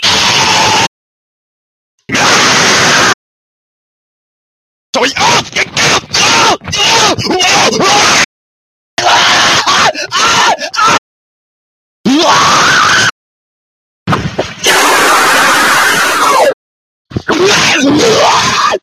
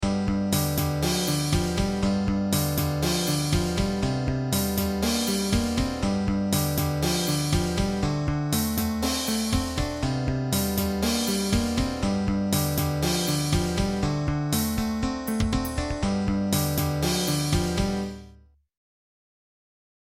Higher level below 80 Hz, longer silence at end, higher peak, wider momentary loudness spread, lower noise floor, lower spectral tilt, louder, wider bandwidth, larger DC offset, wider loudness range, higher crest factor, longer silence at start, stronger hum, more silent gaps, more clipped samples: about the same, -40 dBFS vs -36 dBFS; second, 0.05 s vs 1.7 s; first, 0 dBFS vs -10 dBFS; first, 9 LU vs 3 LU; first, under -90 dBFS vs -53 dBFS; second, -1.5 dB/octave vs -5 dB/octave; first, -7 LUFS vs -25 LUFS; about the same, 16 kHz vs 16.5 kHz; neither; about the same, 3 LU vs 1 LU; second, 10 dB vs 16 dB; about the same, 0 s vs 0 s; neither; first, 0.87-1.98 s, 3.14-4.93 s, 8.25-8.97 s, 10.98-12.04 s, 13.11-14.06 s, 16.53-17.05 s vs none; first, 0.2% vs under 0.1%